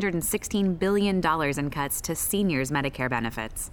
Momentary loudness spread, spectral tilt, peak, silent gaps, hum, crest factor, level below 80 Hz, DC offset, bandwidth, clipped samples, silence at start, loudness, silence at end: 5 LU; -4.5 dB/octave; -10 dBFS; none; none; 16 dB; -44 dBFS; under 0.1%; over 20 kHz; under 0.1%; 0 s; -26 LUFS; 0 s